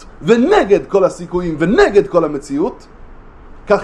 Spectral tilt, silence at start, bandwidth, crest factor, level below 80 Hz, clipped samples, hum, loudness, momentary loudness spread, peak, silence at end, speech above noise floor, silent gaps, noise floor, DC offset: -6.5 dB/octave; 0 s; 10.5 kHz; 14 dB; -36 dBFS; under 0.1%; none; -14 LUFS; 9 LU; 0 dBFS; 0 s; 23 dB; none; -36 dBFS; under 0.1%